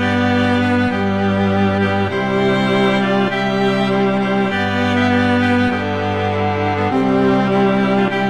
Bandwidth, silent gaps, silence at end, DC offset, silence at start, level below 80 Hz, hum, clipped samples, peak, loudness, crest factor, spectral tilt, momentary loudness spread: 9.6 kHz; none; 0 s; 0.8%; 0 s; -48 dBFS; none; under 0.1%; -4 dBFS; -16 LUFS; 12 dB; -7 dB/octave; 3 LU